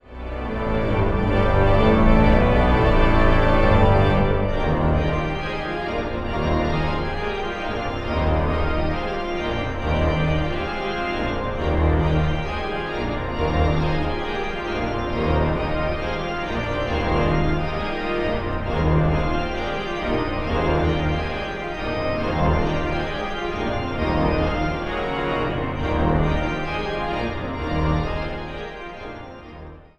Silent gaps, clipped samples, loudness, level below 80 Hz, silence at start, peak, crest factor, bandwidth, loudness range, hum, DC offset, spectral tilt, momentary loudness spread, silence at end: none; under 0.1%; -22 LUFS; -26 dBFS; 0.05 s; -2 dBFS; 18 dB; 7.4 kHz; 6 LU; none; under 0.1%; -7.5 dB/octave; 9 LU; 0.2 s